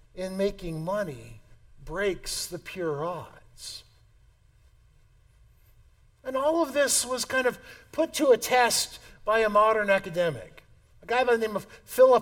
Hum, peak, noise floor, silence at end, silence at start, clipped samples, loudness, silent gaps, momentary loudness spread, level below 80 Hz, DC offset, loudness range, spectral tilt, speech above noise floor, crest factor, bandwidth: none; -8 dBFS; -59 dBFS; 0 s; 0.15 s; under 0.1%; -26 LUFS; none; 18 LU; -54 dBFS; under 0.1%; 13 LU; -3 dB/octave; 33 dB; 20 dB; 18 kHz